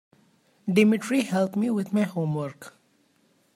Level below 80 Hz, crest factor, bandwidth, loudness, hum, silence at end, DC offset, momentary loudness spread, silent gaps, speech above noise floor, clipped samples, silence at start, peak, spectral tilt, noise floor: -74 dBFS; 20 dB; 15.5 kHz; -25 LUFS; none; 0.85 s; under 0.1%; 15 LU; none; 41 dB; under 0.1%; 0.65 s; -8 dBFS; -6.5 dB/octave; -65 dBFS